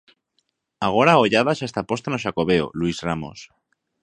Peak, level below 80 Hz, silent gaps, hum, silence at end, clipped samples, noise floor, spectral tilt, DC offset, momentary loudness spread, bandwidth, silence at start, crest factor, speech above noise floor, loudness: 0 dBFS; -52 dBFS; none; none; 0.6 s; under 0.1%; -72 dBFS; -5.5 dB/octave; under 0.1%; 11 LU; 10.5 kHz; 0.8 s; 22 dB; 51 dB; -21 LUFS